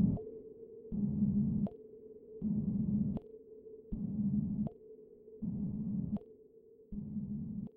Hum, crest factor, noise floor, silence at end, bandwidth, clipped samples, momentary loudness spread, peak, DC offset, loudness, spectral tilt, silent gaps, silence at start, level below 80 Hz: none; 18 dB; -60 dBFS; 0.1 s; 1.3 kHz; under 0.1%; 20 LU; -20 dBFS; under 0.1%; -38 LUFS; -14 dB/octave; none; 0 s; -54 dBFS